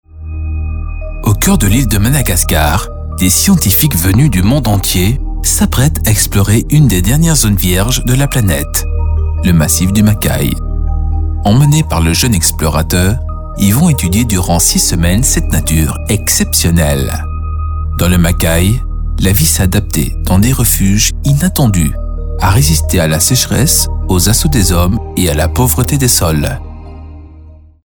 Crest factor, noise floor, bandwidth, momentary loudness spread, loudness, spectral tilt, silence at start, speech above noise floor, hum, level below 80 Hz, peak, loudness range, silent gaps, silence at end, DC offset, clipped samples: 10 dB; -35 dBFS; over 20 kHz; 9 LU; -11 LUFS; -4.5 dB/octave; 0.15 s; 26 dB; none; -18 dBFS; 0 dBFS; 2 LU; none; 0.35 s; under 0.1%; under 0.1%